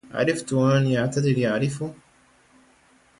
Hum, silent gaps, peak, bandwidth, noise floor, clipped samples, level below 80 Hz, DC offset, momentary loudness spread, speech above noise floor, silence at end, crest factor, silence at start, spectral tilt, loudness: none; none; -8 dBFS; 11.5 kHz; -58 dBFS; under 0.1%; -58 dBFS; under 0.1%; 9 LU; 36 dB; 1.25 s; 16 dB; 0.05 s; -6.5 dB/octave; -23 LUFS